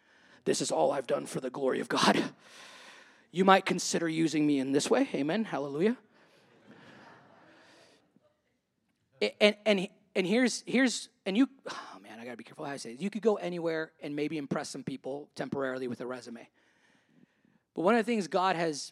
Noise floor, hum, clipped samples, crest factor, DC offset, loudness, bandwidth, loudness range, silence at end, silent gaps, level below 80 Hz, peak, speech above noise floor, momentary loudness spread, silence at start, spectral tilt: -78 dBFS; none; under 0.1%; 26 dB; under 0.1%; -30 LUFS; 14.5 kHz; 9 LU; 0 s; none; -86 dBFS; -6 dBFS; 48 dB; 17 LU; 0.45 s; -4.5 dB/octave